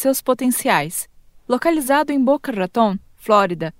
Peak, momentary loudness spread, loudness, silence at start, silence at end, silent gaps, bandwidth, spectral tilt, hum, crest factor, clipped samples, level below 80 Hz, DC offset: 0 dBFS; 9 LU; -19 LUFS; 0 s; 0.1 s; none; 16.5 kHz; -4.5 dB/octave; none; 18 dB; under 0.1%; -52 dBFS; under 0.1%